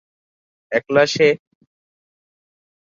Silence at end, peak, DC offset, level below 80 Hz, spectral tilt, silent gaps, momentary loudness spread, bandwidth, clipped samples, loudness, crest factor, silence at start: 1.6 s; -2 dBFS; under 0.1%; -66 dBFS; -4.5 dB/octave; none; 9 LU; 7.6 kHz; under 0.1%; -18 LUFS; 20 dB; 0.7 s